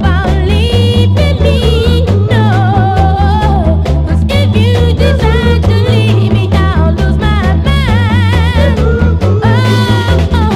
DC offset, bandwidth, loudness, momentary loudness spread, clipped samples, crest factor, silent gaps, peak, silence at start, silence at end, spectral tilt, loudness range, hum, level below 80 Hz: under 0.1%; 12 kHz; -10 LUFS; 2 LU; 0.3%; 8 dB; none; 0 dBFS; 0 s; 0 s; -7 dB/octave; 0 LU; none; -14 dBFS